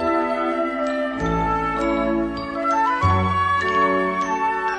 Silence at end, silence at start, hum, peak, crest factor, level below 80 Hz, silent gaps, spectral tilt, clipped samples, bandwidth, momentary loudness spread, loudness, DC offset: 0 s; 0 s; none; -6 dBFS; 14 dB; -40 dBFS; none; -6.5 dB/octave; under 0.1%; 10 kHz; 5 LU; -21 LUFS; under 0.1%